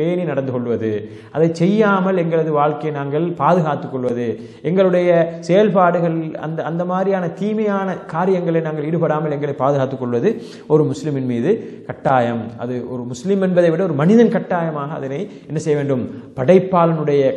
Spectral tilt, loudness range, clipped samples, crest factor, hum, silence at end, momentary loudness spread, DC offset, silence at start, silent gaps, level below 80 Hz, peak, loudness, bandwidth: -8 dB/octave; 3 LU; under 0.1%; 16 dB; none; 0 s; 11 LU; under 0.1%; 0 s; none; -62 dBFS; 0 dBFS; -18 LUFS; 9.2 kHz